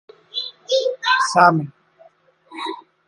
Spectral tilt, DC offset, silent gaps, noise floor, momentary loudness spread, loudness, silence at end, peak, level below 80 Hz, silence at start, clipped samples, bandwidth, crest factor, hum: -4 dB/octave; under 0.1%; none; -53 dBFS; 17 LU; -19 LUFS; 0.3 s; 0 dBFS; -68 dBFS; 0.35 s; under 0.1%; 11.5 kHz; 22 dB; none